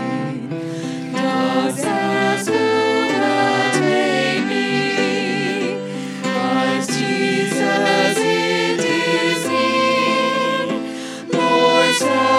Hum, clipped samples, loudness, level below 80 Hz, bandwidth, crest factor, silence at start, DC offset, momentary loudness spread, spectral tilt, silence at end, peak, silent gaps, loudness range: none; under 0.1%; -18 LUFS; -70 dBFS; 16 kHz; 18 dB; 0 s; under 0.1%; 9 LU; -4 dB/octave; 0 s; 0 dBFS; none; 2 LU